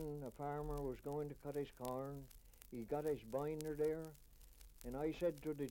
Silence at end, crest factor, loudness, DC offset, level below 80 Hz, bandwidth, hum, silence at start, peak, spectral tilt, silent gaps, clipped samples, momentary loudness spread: 0 s; 20 dB; -45 LUFS; under 0.1%; -60 dBFS; 17 kHz; none; 0 s; -24 dBFS; -7 dB/octave; none; under 0.1%; 15 LU